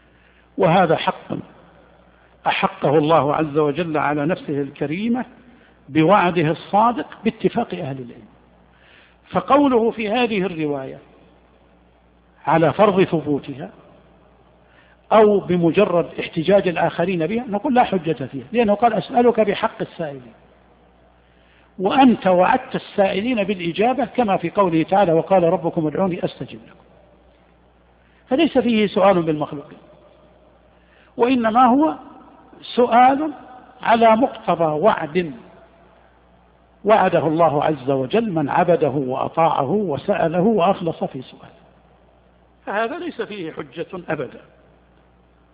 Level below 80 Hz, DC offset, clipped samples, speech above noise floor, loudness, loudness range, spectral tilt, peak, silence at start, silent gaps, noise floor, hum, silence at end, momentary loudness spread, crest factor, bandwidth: -56 dBFS; under 0.1%; under 0.1%; 36 dB; -19 LUFS; 5 LU; -5 dB/octave; -2 dBFS; 0.55 s; none; -54 dBFS; none; 1.2 s; 14 LU; 18 dB; 5 kHz